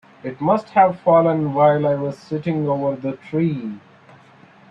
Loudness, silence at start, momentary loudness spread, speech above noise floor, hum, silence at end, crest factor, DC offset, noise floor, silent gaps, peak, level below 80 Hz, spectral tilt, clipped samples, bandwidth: -19 LUFS; 0.25 s; 12 LU; 30 dB; none; 0.9 s; 16 dB; under 0.1%; -48 dBFS; none; -4 dBFS; -62 dBFS; -9.5 dB/octave; under 0.1%; 7.6 kHz